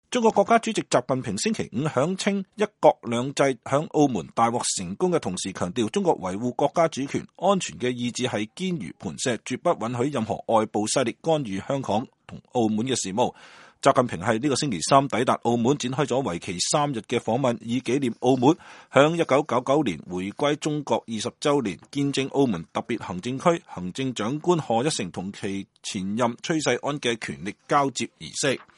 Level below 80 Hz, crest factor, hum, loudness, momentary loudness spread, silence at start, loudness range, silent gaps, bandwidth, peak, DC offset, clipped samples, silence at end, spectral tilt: -62 dBFS; 24 dB; none; -25 LUFS; 9 LU; 0.1 s; 4 LU; none; 11.5 kHz; 0 dBFS; under 0.1%; under 0.1%; 0.15 s; -4.5 dB/octave